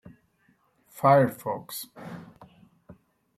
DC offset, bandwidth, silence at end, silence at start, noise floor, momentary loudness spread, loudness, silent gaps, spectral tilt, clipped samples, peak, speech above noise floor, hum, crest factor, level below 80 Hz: under 0.1%; 15.5 kHz; 1.15 s; 0.95 s; -67 dBFS; 22 LU; -25 LUFS; none; -6.5 dB/octave; under 0.1%; -8 dBFS; 42 dB; none; 22 dB; -70 dBFS